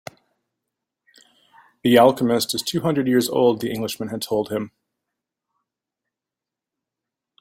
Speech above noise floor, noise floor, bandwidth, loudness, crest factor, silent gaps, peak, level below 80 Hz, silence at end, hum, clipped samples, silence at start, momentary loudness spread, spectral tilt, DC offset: 68 dB; -87 dBFS; 16.5 kHz; -20 LUFS; 22 dB; none; -2 dBFS; -62 dBFS; 2.75 s; none; under 0.1%; 1.85 s; 13 LU; -5 dB/octave; under 0.1%